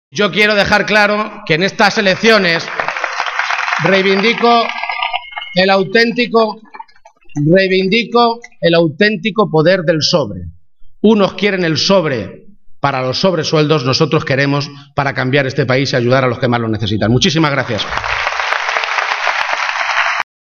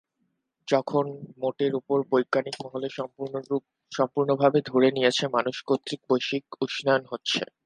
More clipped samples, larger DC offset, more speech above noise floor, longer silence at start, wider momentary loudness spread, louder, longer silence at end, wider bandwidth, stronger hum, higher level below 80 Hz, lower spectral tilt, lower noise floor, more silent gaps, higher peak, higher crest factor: neither; neither; second, 27 dB vs 50 dB; second, 0.15 s vs 0.65 s; second, 8 LU vs 11 LU; first, -13 LUFS vs -26 LUFS; first, 0.35 s vs 0.2 s; first, 13.5 kHz vs 10.5 kHz; neither; first, -46 dBFS vs -74 dBFS; about the same, -5 dB/octave vs -5 dB/octave; second, -40 dBFS vs -76 dBFS; neither; first, 0 dBFS vs -6 dBFS; second, 14 dB vs 20 dB